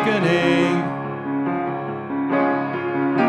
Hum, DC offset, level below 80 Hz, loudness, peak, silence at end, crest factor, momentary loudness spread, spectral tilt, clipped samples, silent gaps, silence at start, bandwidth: none; under 0.1%; -64 dBFS; -21 LUFS; -6 dBFS; 0 s; 16 dB; 9 LU; -7 dB/octave; under 0.1%; none; 0 s; 10.5 kHz